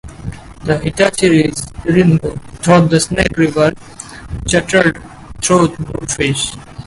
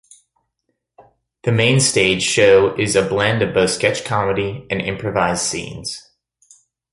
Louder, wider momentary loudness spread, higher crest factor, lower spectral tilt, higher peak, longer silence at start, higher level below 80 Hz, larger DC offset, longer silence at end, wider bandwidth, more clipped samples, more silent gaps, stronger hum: first, -14 LUFS vs -17 LUFS; first, 18 LU vs 13 LU; about the same, 14 dB vs 18 dB; about the same, -5 dB/octave vs -4 dB/octave; about the same, 0 dBFS vs -2 dBFS; second, 0.05 s vs 1.45 s; first, -34 dBFS vs -46 dBFS; neither; second, 0.05 s vs 0.95 s; about the same, 11.5 kHz vs 11.5 kHz; neither; neither; neither